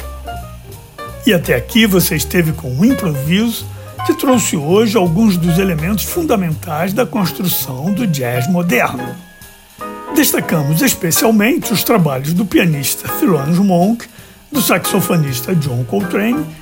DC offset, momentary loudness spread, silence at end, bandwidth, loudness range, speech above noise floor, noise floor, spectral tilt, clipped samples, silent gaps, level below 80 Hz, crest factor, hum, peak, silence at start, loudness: under 0.1%; 14 LU; 0 s; 16.5 kHz; 3 LU; 25 dB; -39 dBFS; -5 dB/octave; under 0.1%; none; -36 dBFS; 14 dB; none; 0 dBFS; 0 s; -14 LUFS